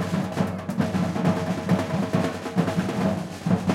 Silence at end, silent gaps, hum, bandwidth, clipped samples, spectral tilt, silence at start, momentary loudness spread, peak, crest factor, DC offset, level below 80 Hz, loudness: 0 s; none; none; 15.5 kHz; under 0.1%; -7 dB/octave; 0 s; 3 LU; -8 dBFS; 16 dB; under 0.1%; -56 dBFS; -25 LUFS